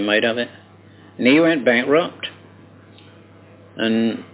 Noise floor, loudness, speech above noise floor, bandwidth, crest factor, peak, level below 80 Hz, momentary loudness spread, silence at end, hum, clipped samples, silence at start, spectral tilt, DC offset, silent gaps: -46 dBFS; -18 LUFS; 28 dB; 4 kHz; 18 dB; -2 dBFS; -64 dBFS; 14 LU; 0.1 s; none; under 0.1%; 0 s; -9 dB/octave; under 0.1%; none